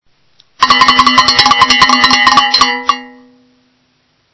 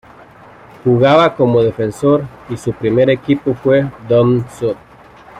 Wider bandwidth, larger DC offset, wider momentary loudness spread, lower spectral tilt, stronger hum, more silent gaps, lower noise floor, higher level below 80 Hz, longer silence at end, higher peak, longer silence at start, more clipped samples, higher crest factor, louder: second, 8 kHz vs 12 kHz; neither; about the same, 9 LU vs 11 LU; second, -1 dB/octave vs -7.5 dB/octave; neither; neither; first, -57 dBFS vs -40 dBFS; first, -40 dBFS vs -48 dBFS; first, 1.25 s vs 0 s; about the same, 0 dBFS vs -2 dBFS; second, 0.6 s vs 0.85 s; first, 2% vs under 0.1%; about the same, 10 dB vs 14 dB; first, -7 LUFS vs -14 LUFS